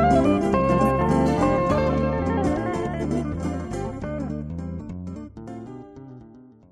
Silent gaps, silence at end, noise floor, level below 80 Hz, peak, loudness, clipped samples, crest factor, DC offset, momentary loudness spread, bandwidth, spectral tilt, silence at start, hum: none; 0.3 s; -47 dBFS; -36 dBFS; -8 dBFS; -23 LUFS; under 0.1%; 16 dB; under 0.1%; 18 LU; 13.5 kHz; -8 dB/octave; 0 s; none